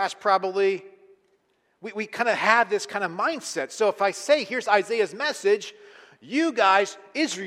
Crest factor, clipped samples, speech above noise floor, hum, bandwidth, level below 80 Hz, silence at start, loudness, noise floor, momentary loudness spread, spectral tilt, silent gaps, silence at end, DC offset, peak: 22 dB; under 0.1%; 44 dB; none; 14 kHz; -80 dBFS; 0 s; -24 LUFS; -68 dBFS; 11 LU; -3 dB/octave; none; 0 s; under 0.1%; -2 dBFS